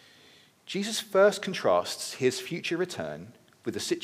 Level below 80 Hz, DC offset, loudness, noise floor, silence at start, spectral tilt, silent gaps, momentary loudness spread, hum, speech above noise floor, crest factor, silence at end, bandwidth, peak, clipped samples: -76 dBFS; under 0.1%; -28 LUFS; -58 dBFS; 0.65 s; -3.5 dB/octave; none; 14 LU; none; 30 dB; 18 dB; 0 s; 15.5 kHz; -10 dBFS; under 0.1%